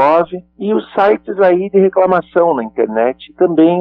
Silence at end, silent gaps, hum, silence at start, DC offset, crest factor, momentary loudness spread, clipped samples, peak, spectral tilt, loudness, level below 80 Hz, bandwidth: 0 s; none; none; 0 s; under 0.1%; 12 dB; 7 LU; under 0.1%; 0 dBFS; -9.5 dB/octave; -14 LUFS; -56 dBFS; 5.4 kHz